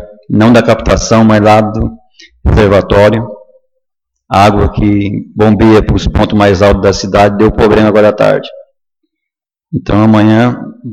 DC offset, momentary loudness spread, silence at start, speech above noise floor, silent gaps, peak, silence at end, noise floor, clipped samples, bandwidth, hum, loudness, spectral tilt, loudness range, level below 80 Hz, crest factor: under 0.1%; 10 LU; 0 s; 72 dB; none; 0 dBFS; 0 s; -79 dBFS; 0.2%; 11 kHz; none; -8 LUFS; -6.5 dB/octave; 3 LU; -22 dBFS; 8 dB